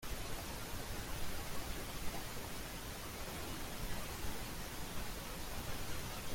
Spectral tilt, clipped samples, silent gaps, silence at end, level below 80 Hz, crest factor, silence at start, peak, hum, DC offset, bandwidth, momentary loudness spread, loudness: -3.5 dB/octave; under 0.1%; none; 0 s; -48 dBFS; 14 dB; 0 s; -28 dBFS; none; under 0.1%; 16.5 kHz; 1 LU; -45 LUFS